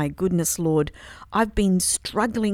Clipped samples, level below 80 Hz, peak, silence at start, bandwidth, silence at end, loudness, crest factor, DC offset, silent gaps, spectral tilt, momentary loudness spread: under 0.1%; -40 dBFS; -6 dBFS; 0 s; 16.5 kHz; 0 s; -23 LUFS; 18 dB; under 0.1%; none; -4.5 dB/octave; 7 LU